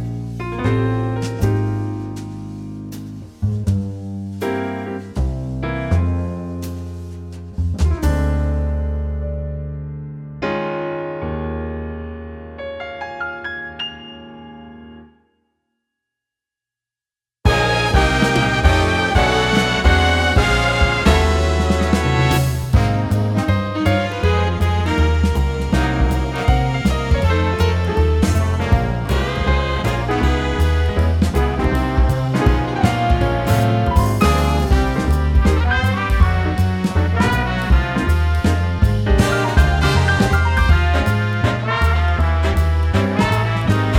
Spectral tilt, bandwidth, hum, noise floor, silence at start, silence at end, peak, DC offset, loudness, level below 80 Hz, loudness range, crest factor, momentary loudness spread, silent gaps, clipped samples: -6 dB/octave; 15.5 kHz; none; under -90 dBFS; 0 s; 0 s; 0 dBFS; under 0.1%; -18 LUFS; -22 dBFS; 11 LU; 16 dB; 13 LU; none; under 0.1%